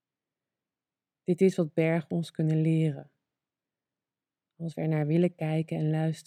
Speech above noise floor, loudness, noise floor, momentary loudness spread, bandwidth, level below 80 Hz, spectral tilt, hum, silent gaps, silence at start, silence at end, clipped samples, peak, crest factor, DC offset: over 63 dB; -28 LUFS; under -90 dBFS; 10 LU; 9.8 kHz; -78 dBFS; -8.5 dB/octave; none; none; 1.3 s; 0.05 s; under 0.1%; -12 dBFS; 18 dB; under 0.1%